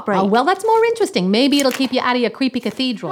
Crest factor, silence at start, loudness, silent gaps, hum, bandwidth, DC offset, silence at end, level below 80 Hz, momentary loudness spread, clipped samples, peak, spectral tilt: 16 dB; 0 s; -17 LUFS; none; none; 18 kHz; under 0.1%; 0 s; -64 dBFS; 6 LU; under 0.1%; -2 dBFS; -4.5 dB/octave